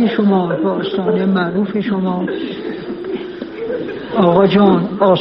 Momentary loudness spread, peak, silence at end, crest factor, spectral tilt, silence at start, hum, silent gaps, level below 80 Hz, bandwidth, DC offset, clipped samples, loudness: 14 LU; 0 dBFS; 0 s; 14 dB; -6 dB/octave; 0 s; none; none; -52 dBFS; 5.6 kHz; under 0.1%; under 0.1%; -16 LUFS